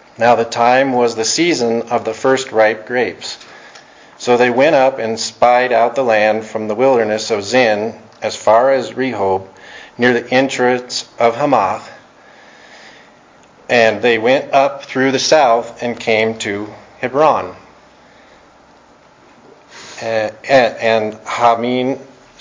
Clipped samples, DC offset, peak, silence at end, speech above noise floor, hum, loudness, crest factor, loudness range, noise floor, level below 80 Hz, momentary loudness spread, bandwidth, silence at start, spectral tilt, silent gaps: under 0.1%; under 0.1%; 0 dBFS; 0.4 s; 32 dB; none; -14 LUFS; 16 dB; 5 LU; -46 dBFS; -58 dBFS; 12 LU; 7.6 kHz; 0.2 s; -3.5 dB/octave; none